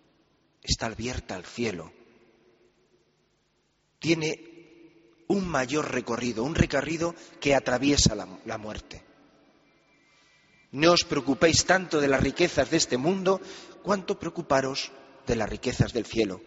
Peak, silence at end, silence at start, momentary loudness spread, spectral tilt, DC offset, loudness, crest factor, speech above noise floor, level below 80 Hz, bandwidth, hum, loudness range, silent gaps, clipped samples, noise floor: -6 dBFS; 0.05 s; 0.65 s; 16 LU; -4 dB/octave; under 0.1%; -26 LUFS; 22 dB; 44 dB; -46 dBFS; 8 kHz; none; 11 LU; none; under 0.1%; -71 dBFS